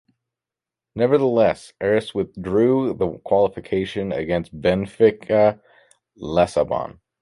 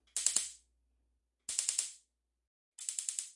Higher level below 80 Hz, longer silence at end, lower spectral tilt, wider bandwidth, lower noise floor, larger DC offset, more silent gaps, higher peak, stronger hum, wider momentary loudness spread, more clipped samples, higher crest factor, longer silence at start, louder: first, -48 dBFS vs -78 dBFS; first, 0.3 s vs 0.05 s; first, -7 dB/octave vs 3.5 dB/octave; about the same, 11.5 kHz vs 11.5 kHz; first, -88 dBFS vs -80 dBFS; neither; second, none vs 2.47-2.72 s; first, -4 dBFS vs -10 dBFS; neither; second, 9 LU vs 12 LU; neither; second, 18 dB vs 30 dB; first, 0.95 s vs 0.15 s; first, -20 LUFS vs -35 LUFS